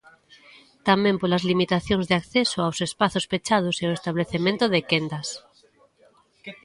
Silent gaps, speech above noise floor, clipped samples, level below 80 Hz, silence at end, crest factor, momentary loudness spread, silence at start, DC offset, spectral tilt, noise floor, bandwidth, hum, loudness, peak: none; 36 dB; under 0.1%; -54 dBFS; 0.1 s; 20 dB; 9 LU; 0.85 s; under 0.1%; -5 dB/octave; -59 dBFS; 11.5 kHz; none; -23 LUFS; -4 dBFS